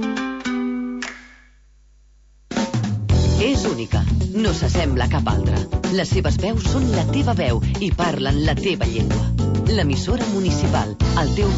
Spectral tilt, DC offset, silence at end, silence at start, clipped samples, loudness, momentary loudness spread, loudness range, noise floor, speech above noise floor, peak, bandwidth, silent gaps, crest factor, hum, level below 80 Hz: -6 dB/octave; under 0.1%; 0 s; 0 s; under 0.1%; -20 LUFS; 5 LU; 3 LU; -51 dBFS; 32 dB; -8 dBFS; 8 kHz; none; 12 dB; 50 Hz at -40 dBFS; -26 dBFS